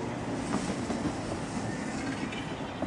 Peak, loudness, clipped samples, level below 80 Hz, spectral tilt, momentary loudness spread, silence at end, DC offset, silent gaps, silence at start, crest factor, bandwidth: -16 dBFS; -34 LUFS; under 0.1%; -52 dBFS; -5 dB/octave; 3 LU; 0 s; under 0.1%; none; 0 s; 18 dB; 11.5 kHz